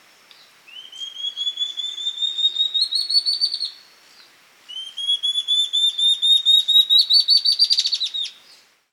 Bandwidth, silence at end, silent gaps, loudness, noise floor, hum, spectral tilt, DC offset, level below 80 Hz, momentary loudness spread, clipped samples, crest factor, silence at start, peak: 16 kHz; 0.6 s; none; -16 LUFS; -52 dBFS; none; 4.5 dB/octave; under 0.1%; under -90 dBFS; 16 LU; under 0.1%; 18 dB; 0.7 s; -2 dBFS